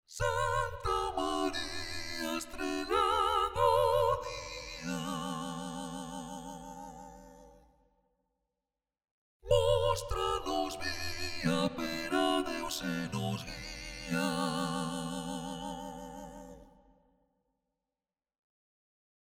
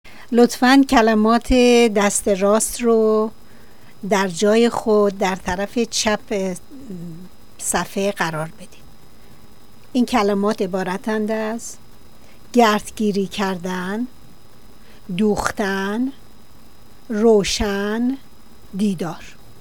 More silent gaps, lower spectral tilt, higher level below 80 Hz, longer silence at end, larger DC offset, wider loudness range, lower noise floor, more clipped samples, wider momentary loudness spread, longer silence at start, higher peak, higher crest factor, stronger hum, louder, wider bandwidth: first, 9.11-9.40 s vs none; about the same, -4.5 dB/octave vs -4.5 dB/octave; second, -50 dBFS vs -42 dBFS; first, 2.65 s vs 0.3 s; second, under 0.1% vs 1%; first, 15 LU vs 8 LU; first, under -90 dBFS vs -48 dBFS; neither; about the same, 17 LU vs 15 LU; about the same, 0.1 s vs 0.2 s; second, -14 dBFS vs 0 dBFS; about the same, 20 dB vs 20 dB; neither; second, -33 LUFS vs -19 LUFS; about the same, 17.5 kHz vs 19 kHz